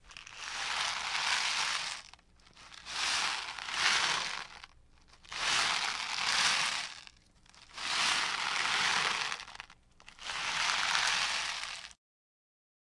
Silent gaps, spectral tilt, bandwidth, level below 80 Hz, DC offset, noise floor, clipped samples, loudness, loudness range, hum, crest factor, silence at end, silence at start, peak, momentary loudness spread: none; 1 dB/octave; 11.5 kHz; -66 dBFS; under 0.1%; -61 dBFS; under 0.1%; -31 LUFS; 3 LU; none; 26 dB; 1 s; 0.05 s; -10 dBFS; 18 LU